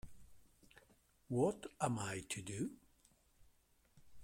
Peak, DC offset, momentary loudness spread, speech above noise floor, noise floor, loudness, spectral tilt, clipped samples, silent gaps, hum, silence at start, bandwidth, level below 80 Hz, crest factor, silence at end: -22 dBFS; under 0.1%; 7 LU; 32 dB; -72 dBFS; -42 LUFS; -5 dB/octave; under 0.1%; none; none; 0.05 s; 16.5 kHz; -70 dBFS; 22 dB; 0 s